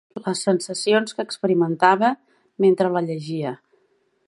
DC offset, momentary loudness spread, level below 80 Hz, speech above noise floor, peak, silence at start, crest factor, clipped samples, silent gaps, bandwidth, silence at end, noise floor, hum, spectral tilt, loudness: under 0.1%; 11 LU; -74 dBFS; 45 dB; -2 dBFS; 0.15 s; 20 dB; under 0.1%; none; 11.5 kHz; 0.75 s; -65 dBFS; none; -5 dB/octave; -21 LUFS